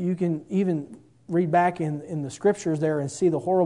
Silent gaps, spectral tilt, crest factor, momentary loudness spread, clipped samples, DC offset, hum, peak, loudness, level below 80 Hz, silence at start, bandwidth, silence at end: none; -7.5 dB/octave; 16 dB; 9 LU; under 0.1%; under 0.1%; none; -8 dBFS; -25 LUFS; -66 dBFS; 0 s; 11 kHz; 0 s